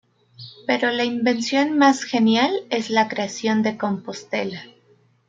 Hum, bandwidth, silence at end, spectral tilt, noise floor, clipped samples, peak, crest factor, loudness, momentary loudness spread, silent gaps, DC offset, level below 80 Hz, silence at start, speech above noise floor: none; 7.8 kHz; 0.6 s; -4 dB/octave; -58 dBFS; under 0.1%; -2 dBFS; 18 dB; -21 LUFS; 13 LU; none; under 0.1%; -68 dBFS; 0.4 s; 38 dB